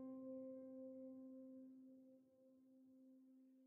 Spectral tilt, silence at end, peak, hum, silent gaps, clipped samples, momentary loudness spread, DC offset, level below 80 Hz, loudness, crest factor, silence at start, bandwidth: -8 dB/octave; 0 s; -46 dBFS; none; none; under 0.1%; 15 LU; under 0.1%; under -90 dBFS; -58 LUFS; 12 dB; 0 s; 2.2 kHz